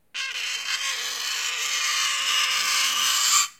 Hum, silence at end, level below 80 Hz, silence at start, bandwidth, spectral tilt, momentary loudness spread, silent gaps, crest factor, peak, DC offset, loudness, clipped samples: none; 0.05 s; -78 dBFS; 0.15 s; 16.5 kHz; 4.5 dB/octave; 8 LU; none; 20 dB; -6 dBFS; under 0.1%; -22 LUFS; under 0.1%